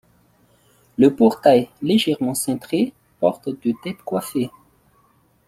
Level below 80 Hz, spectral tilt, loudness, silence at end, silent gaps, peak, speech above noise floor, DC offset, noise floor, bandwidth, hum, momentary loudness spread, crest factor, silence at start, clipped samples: -60 dBFS; -5 dB/octave; -20 LUFS; 1 s; none; -2 dBFS; 40 dB; under 0.1%; -59 dBFS; 15.5 kHz; none; 11 LU; 18 dB; 1 s; under 0.1%